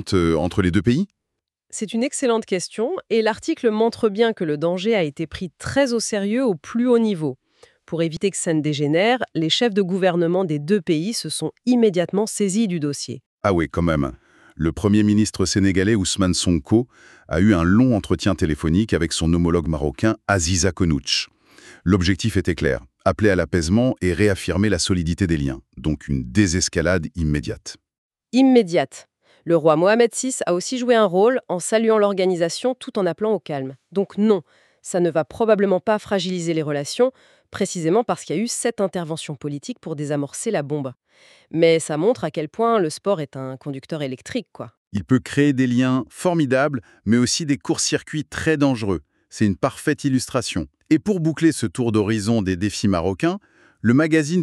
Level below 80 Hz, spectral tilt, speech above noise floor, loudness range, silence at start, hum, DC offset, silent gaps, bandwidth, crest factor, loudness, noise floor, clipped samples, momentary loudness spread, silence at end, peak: -42 dBFS; -5 dB/octave; 61 dB; 4 LU; 0 s; none; under 0.1%; 13.26-13.38 s, 27.98-28.10 s, 44.77-44.91 s; 13 kHz; 18 dB; -20 LUFS; -81 dBFS; under 0.1%; 11 LU; 0 s; -2 dBFS